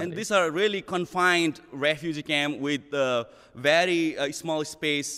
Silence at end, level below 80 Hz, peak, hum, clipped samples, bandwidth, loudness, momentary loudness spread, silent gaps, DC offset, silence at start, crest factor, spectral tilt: 0 s; -66 dBFS; -8 dBFS; none; under 0.1%; 15 kHz; -25 LUFS; 8 LU; none; under 0.1%; 0 s; 18 dB; -3.5 dB/octave